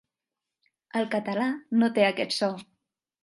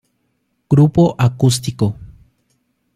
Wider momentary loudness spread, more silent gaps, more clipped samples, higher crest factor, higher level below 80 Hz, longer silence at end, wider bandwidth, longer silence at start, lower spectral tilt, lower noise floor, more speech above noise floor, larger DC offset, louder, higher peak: about the same, 8 LU vs 9 LU; neither; neither; about the same, 20 dB vs 16 dB; second, -80 dBFS vs -44 dBFS; second, 0.6 s vs 0.9 s; second, 11.5 kHz vs 14 kHz; first, 0.95 s vs 0.7 s; second, -5 dB/octave vs -6.5 dB/octave; first, -88 dBFS vs -67 dBFS; first, 62 dB vs 54 dB; neither; second, -26 LUFS vs -15 LUFS; second, -8 dBFS vs -2 dBFS